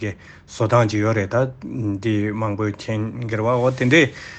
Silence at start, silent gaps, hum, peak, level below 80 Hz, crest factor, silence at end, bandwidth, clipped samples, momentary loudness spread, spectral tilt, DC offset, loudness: 0 s; none; none; -2 dBFS; -52 dBFS; 18 dB; 0 s; 8.4 kHz; under 0.1%; 10 LU; -6.5 dB/octave; under 0.1%; -20 LUFS